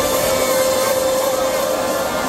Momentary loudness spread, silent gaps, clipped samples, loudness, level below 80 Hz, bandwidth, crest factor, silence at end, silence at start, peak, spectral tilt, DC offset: 3 LU; none; under 0.1%; -17 LUFS; -44 dBFS; 16.5 kHz; 12 dB; 0 s; 0 s; -6 dBFS; -2.5 dB/octave; under 0.1%